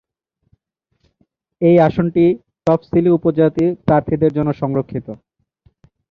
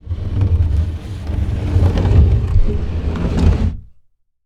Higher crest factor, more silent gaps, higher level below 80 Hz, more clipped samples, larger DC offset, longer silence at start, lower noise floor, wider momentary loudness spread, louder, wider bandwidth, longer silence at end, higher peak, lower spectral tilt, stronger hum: about the same, 16 dB vs 14 dB; neither; second, -48 dBFS vs -20 dBFS; neither; neither; first, 1.6 s vs 0.05 s; first, -69 dBFS vs -52 dBFS; about the same, 10 LU vs 10 LU; about the same, -16 LUFS vs -17 LUFS; second, 5.6 kHz vs 7.4 kHz; first, 0.95 s vs 0.55 s; about the same, -2 dBFS vs 0 dBFS; first, -10 dB/octave vs -8.5 dB/octave; neither